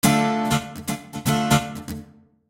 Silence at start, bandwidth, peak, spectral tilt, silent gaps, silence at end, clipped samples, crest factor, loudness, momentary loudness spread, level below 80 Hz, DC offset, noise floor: 0.05 s; 17 kHz; -4 dBFS; -4.5 dB/octave; none; 0.45 s; under 0.1%; 18 dB; -23 LUFS; 15 LU; -46 dBFS; under 0.1%; -46 dBFS